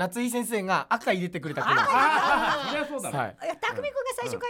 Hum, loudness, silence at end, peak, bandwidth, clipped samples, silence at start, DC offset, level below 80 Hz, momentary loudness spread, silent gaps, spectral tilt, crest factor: none; -26 LUFS; 0 s; -10 dBFS; 17.5 kHz; under 0.1%; 0 s; under 0.1%; -60 dBFS; 10 LU; none; -4 dB/octave; 16 dB